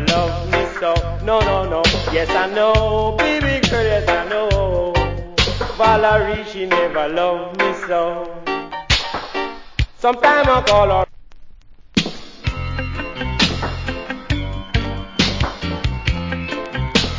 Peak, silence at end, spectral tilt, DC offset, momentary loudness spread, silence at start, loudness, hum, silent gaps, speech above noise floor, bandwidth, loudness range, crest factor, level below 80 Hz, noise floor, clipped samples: 0 dBFS; 0 s; -5 dB/octave; under 0.1%; 11 LU; 0 s; -18 LUFS; none; none; 23 dB; 7.6 kHz; 5 LU; 18 dB; -28 dBFS; -39 dBFS; under 0.1%